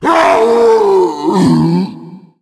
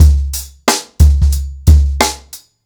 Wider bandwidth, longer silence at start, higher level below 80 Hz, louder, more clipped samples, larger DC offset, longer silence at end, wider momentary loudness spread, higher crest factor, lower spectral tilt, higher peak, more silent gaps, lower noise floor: second, 12 kHz vs 19.5 kHz; about the same, 0 s vs 0 s; second, -50 dBFS vs -12 dBFS; first, -10 LUFS vs -13 LUFS; neither; neither; about the same, 0.25 s vs 0.3 s; about the same, 6 LU vs 6 LU; about the same, 10 dB vs 12 dB; first, -7 dB/octave vs -4.5 dB/octave; about the same, 0 dBFS vs 0 dBFS; neither; second, -32 dBFS vs -37 dBFS